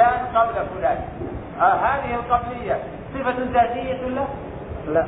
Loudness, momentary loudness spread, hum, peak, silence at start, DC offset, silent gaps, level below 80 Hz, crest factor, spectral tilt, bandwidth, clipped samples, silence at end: -23 LUFS; 13 LU; none; -4 dBFS; 0 s; under 0.1%; none; -42 dBFS; 18 dB; -10.5 dB/octave; 4 kHz; under 0.1%; 0 s